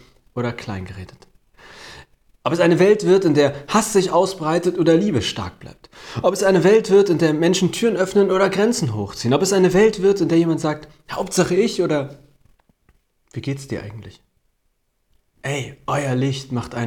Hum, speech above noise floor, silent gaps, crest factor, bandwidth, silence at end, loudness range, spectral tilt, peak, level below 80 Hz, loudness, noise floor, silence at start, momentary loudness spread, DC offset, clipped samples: none; 50 dB; none; 14 dB; 16.5 kHz; 0 s; 12 LU; -5.5 dB/octave; -4 dBFS; -52 dBFS; -18 LUFS; -68 dBFS; 0.35 s; 17 LU; under 0.1%; under 0.1%